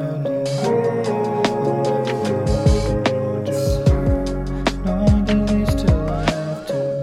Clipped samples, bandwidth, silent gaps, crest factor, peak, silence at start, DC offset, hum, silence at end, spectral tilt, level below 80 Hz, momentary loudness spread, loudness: under 0.1%; 15 kHz; none; 14 dB; -4 dBFS; 0 s; under 0.1%; none; 0 s; -7 dB/octave; -26 dBFS; 5 LU; -20 LUFS